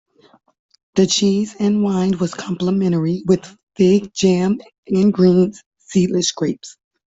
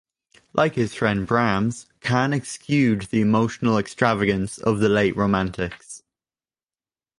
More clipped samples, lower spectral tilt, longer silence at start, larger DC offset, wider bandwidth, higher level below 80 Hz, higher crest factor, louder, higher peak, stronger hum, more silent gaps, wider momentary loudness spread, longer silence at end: neither; about the same, -6 dB/octave vs -6 dB/octave; first, 0.95 s vs 0.55 s; neither; second, 8 kHz vs 11.5 kHz; about the same, -54 dBFS vs -50 dBFS; second, 14 dB vs 20 dB; first, -17 LUFS vs -22 LUFS; about the same, -4 dBFS vs -4 dBFS; neither; first, 3.63-3.67 s, 4.78-4.83 s, 5.66-5.71 s vs none; about the same, 9 LU vs 9 LU; second, 0.45 s vs 1.2 s